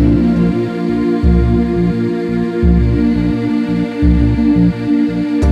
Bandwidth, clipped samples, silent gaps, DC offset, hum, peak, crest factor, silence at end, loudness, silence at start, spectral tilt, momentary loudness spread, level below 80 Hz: 8.4 kHz; under 0.1%; none; under 0.1%; none; -2 dBFS; 12 dB; 0 s; -14 LUFS; 0 s; -9.5 dB/octave; 5 LU; -20 dBFS